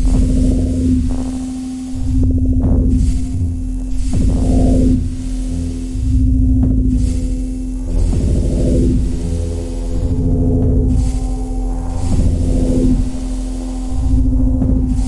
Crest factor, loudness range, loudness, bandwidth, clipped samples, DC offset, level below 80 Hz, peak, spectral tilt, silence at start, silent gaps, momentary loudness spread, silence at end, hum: 10 dB; 2 LU; -17 LUFS; 11.5 kHz; under 0.1%; under 0.1%; -16 dBFS; -4 dBFS; -8.5 dB/octave; 0 s; none; 9 LU; 0 s; none